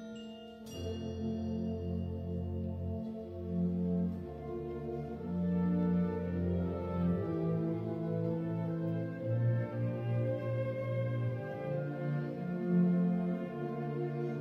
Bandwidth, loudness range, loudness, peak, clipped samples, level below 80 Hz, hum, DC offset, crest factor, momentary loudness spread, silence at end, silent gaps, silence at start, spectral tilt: 6 kHz; 4 LU; -36 LUFS; -20 dBFS; under 0.1%; -56 dBFS; none; under 0.1%; 14 dB; 9 LU; 0 s; none; 0 s; -9.5 dB/octave